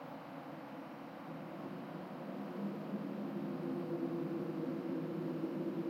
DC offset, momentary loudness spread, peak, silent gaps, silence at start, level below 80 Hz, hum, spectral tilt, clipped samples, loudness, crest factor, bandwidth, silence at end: under 0.1%; 9 LU; -28 dBFS; none; 0 s; -88 dBFS; none; -8.5 dB/octave; under 0.1%; -43 LUFS; 14 dB; 16.5 kHz; 0 s